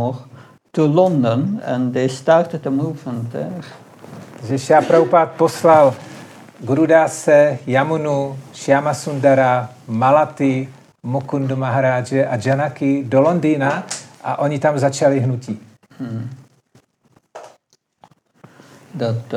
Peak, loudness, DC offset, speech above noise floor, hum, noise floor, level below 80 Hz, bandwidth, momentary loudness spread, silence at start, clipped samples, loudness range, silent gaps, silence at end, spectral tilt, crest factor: -2 dBFS; -17 LUFS; under 0.1%; 44 dB; none; -60 dBFS; -72 dBFS; 13.5 kHz; 17 LU; 0 s; under 0.1%; 7 LU; none; 0 s; -6.5 dB/octave; 16 dB